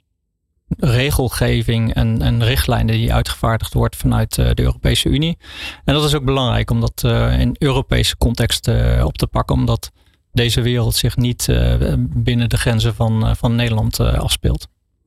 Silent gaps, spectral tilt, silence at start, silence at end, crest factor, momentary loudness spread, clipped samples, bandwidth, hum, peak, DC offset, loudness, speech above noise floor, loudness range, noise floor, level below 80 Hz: none; -5.5 dB/octave; 0.7 s; 0.4 s; 10 dB; 3 LU; under 0.1%; 15 kHz; none; -6 dBFS; under 0.1%; -17 LUFS; 55 dB; 1 LU; -70 dBFS; -24 dBFS